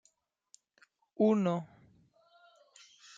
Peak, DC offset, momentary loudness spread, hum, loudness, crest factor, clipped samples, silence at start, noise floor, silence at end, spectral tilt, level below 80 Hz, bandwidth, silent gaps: -16 dBFS; under 0.1%; 28 LU; none; -31 LUFS; 20 dB; under 0.1%; 1.2 s; -74 dBFS; 1.55 s; -7.5 dB/octave; -82 dBFS; 7.8 kHz; none